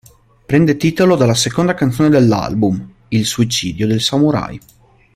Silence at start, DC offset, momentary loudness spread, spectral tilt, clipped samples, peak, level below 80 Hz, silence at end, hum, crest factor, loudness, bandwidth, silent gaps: 0.5 s; under 0.1%; 8 LU; -5.5 dB/octave; under 0.1%; 0 dBFS; -44 dBFS; 0.6 s; none; 14 dB; -14 LUFS; 16 kHz; none